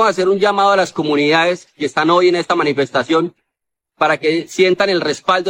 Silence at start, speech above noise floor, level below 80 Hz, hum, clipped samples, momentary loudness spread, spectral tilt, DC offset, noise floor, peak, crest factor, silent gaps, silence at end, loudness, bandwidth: 0 s; 63 dB; -64 dBFS; none; under 0.1%; 5 LU; -4.5 dB/octave; under 0.1%; -78 dBFS; -2 dBFS; 14 dB; none; 0 s; -15 LUFS; 10.5 kHz